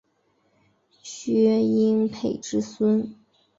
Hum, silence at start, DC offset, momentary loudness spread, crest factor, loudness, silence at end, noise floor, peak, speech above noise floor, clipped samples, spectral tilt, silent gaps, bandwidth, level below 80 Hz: none; 1.05 s; under 0.1%; 16 LU; 16 dB; -23 LUFS; 0.45 s; -68 dBFS; -10 dBFS; 46 dB; under 0.1%; -6.5 dB/octave; none; 7.8 kHz; -64 dBFS